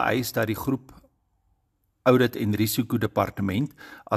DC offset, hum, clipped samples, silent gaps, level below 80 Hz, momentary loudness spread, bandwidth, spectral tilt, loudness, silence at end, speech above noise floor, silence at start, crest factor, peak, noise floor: under 0.1%; none; under 0.1%; none; -56 dBFS; 9 LU; 14.5 kHz; -5.5 dB/octave; -25 LUFS; 0 s; 47 dB; 0 s; 22 dB; -4 dBFS; -72 dBFS